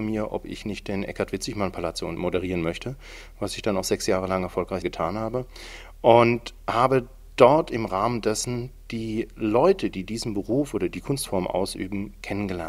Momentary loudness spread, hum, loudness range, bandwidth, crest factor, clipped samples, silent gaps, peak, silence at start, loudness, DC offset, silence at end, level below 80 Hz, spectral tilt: 14 LU; none; 7 LU; 16 kHz; 24 dB; under 0.1%; none; 0 dBFS; 0 s; -25 LUFS; under 0.1%; 0 s; -44 dBFS; -5.5 dB/octave